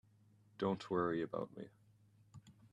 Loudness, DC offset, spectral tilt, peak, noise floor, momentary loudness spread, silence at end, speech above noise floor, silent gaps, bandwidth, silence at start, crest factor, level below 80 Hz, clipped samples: -40 LUFS; under 0.1%; -7.5 dB/octave; -24 dBFS; -69 dBFS; 24 LU; 0.05 s; 29 dB; none; 10.5 kHz; 0.6 s; 20 dB; -76 dBFS; under 0.1%